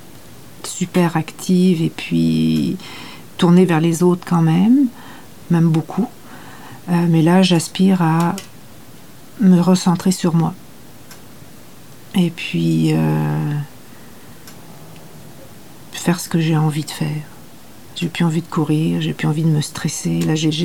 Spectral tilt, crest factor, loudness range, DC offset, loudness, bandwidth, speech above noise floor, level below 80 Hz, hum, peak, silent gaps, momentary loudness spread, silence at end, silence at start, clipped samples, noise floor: -6.5 dB/octave; 16 dB; 7 LU; 0.9%; -17 LUFS; 16.5 kHz; 26 dB; -54 dBFS; none; -2 dBFS; none; 18 LU; 0 s; 0.15 s; under 0.1%; -42 dBFS